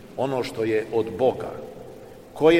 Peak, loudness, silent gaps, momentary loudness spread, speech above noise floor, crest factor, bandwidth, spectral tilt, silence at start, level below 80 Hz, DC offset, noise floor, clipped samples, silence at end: -6 dBFS; -25 LUFS; none; 20 LU; 18 dB; 18 dB; 15.5 kHz; -6 dB/octave; 0 s; -54 dBFS; 0.2%; -43 dBFS; under 0.1%; 0 s